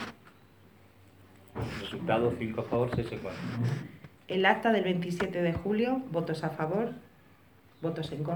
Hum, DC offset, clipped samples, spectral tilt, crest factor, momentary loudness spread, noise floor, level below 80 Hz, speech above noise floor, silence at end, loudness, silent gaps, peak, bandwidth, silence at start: none; under 0.1%; under 0.1%; -7 dB/octave; 24 dB; 12 LU; -59 dBFS; -58 dBFS; 29 dB; 0 s; -31 LUFS; none; -8 dBFS; over 20 kHz; 0 s